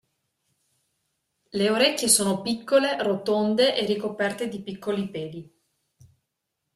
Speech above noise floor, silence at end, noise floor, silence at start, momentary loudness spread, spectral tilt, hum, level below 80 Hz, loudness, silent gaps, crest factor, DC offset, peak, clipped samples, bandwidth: 57 dB; 1.35 s; -81 dBFS; 1.55 s; 14 LU; -3 dB/octave; none; -68 dBFS; -23 LUFS; none; 22 dB; under 0.1%; -6 dBFS; under 0.1%; 15.5 kHz